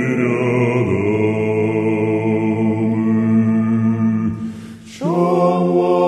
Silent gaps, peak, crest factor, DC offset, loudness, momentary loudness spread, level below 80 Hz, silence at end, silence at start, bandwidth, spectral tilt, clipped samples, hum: none; -4 dBFS; 12 dB; under 0.1%; -17 LUFS; 7 LU; -56 dBFS; 0 s; 0 s; 9.2 kHz; -8.5 dB/octave; under 0.1%; none